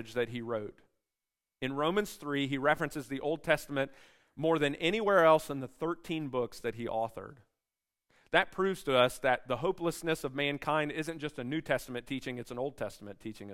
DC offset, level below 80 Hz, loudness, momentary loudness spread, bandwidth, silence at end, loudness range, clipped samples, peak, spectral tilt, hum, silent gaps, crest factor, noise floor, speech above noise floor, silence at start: under 0.1%; -62 dBFS; -32 LUFS; 12 LU; 16 kHz; 0 s; 5 LU; under 0.1%; -10 dBFS; -5 dB/octave; none; none; 24 dB; under -90 dBFS; over 58 dB; 0 s